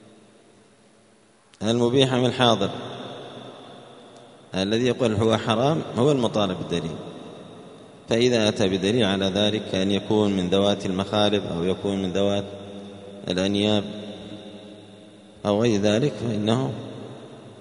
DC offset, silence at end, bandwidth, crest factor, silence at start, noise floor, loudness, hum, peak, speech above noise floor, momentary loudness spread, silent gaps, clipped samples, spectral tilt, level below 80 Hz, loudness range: under 0.1%; 0 s; 10.5 kHz; 22 dB; 1.6 s; -57 dBFS; -23 LUFS; none; -2 dBFS; 35 dB; 20 LU; none; under 0.1%; -5.5 dB/octave; -58 dBFS; 4 LU